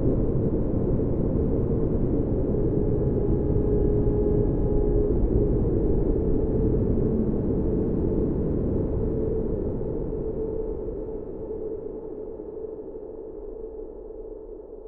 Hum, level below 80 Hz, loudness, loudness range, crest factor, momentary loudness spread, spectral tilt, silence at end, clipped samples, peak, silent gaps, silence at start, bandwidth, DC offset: none; -30 dBFS; -26 LUFS; 11 LU; 14 dB; 14 LU; -14.5 dB/octave; 0 s; under 0.1%; -10 dBFS; none; 0 s; 2.6 kHz; under 0.1%